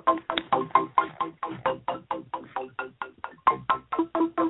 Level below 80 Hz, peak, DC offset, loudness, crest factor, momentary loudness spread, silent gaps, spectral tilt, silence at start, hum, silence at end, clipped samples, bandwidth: -64 dBFS; -6 dBFS; under 0.1%; -28 LUFS; 22 dB; 12 LU; none; -9 dB/octave; 0.05 s; none; 0 s; under 0.1%; 4.1 kHz